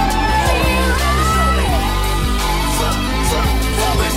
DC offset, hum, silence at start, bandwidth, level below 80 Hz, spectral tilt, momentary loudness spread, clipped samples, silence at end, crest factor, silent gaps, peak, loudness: under 0.1%; none; 0 s; 16.5 kHz; -18 dBFS; -4 dB/octave; 3 LU; under 0.1%; 0 s; 12 dB; none; -2 dBFS; -16 LUFS